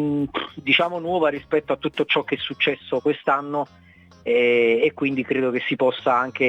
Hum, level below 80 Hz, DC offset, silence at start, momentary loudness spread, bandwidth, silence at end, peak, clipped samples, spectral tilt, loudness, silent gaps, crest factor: none; -62 dBFS; under 0.1%; 0 s; 9 LU; 8 kHz; 0 s; -4 dBFS; under 0.1%; -6.5 dB/octave; -21 LUFS; none; 18 dB